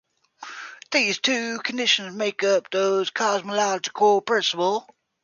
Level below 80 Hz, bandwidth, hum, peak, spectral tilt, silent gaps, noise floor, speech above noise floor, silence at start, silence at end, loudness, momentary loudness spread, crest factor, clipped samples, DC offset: -76 dBFS; 7.4 kHz; none; -6 dBFS; -2 dB/octave; none; -43 dBFS; 21 dB; 0.4 s; 0.4 s; -22 LUFS; 13 LU; 18 dB; under 0.1%; under 0.1%